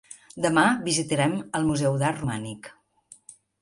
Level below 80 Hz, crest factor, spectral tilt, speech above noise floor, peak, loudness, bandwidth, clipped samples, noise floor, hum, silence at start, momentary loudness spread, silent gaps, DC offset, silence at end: -56 dBFS; 20 dB; -4.5 dB/octave; 30 dB; -6 dBFS; -24 LUFS; 11.5 kHz; under 0.1%; -55 dBFS; none; 0.1 s; 15 LU; none; under 0.1%; 0.9 s